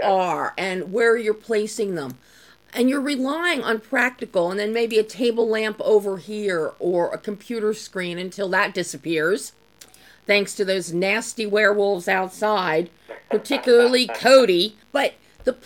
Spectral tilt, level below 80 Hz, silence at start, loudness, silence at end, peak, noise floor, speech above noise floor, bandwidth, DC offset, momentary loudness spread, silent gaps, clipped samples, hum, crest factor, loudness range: -4 dB/octave; -64 dBFS; 0 s; -21 LUFS; 0.1 s; -2 dBFS; -50 dBFS; 29 dB; 17 kHz; under 0.1%; 10 LU; none; under 0.1%; none; 20 dB; 5 LU